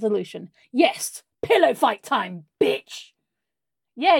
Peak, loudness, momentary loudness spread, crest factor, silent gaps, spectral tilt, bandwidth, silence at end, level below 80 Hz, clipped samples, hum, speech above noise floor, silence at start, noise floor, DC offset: -4 dBFS; -22 LUFS; 17 LU; 20 dB; none; -3.5 dB/octave; 17.5 kHz; 0 s; -68 dBFS; under 0.1%; none; 65 dB; 0 s; -87 dBFS; under 0.1%